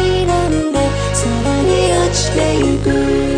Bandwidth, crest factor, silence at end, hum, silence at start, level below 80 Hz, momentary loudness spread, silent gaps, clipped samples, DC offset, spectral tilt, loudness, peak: 10.5 kHz; 12 dB; 0 s; none; 0 s; -26 dBFS; 3 LU; none; under 0.1%; under 0.1%; -5 dB/octave; -15 LUFS; -2 dBFS